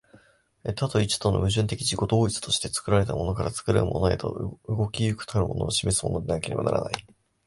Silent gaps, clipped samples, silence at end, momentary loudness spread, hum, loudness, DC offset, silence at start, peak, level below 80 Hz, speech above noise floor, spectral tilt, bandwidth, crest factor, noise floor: none; under 0.1%; 0.45 s; 7 LU; none; -26 LUFS; under 0.1%; 0.65 s; -4 dBFS; -42 dBFS; 32 dB; -5 dB/octave; 11.5 kHz; 22 dB; -58 dBFS